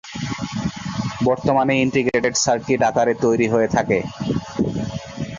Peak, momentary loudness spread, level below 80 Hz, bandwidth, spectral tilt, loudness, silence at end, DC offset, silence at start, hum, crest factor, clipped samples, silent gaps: -4 dBFS; 9 LU; -46 dBFS; 7.6 kHz; -5 dB/octave; -20 LUFS; 0 s; under 0.1%; 0.05 s; none; 16 dB; under 0.1%; none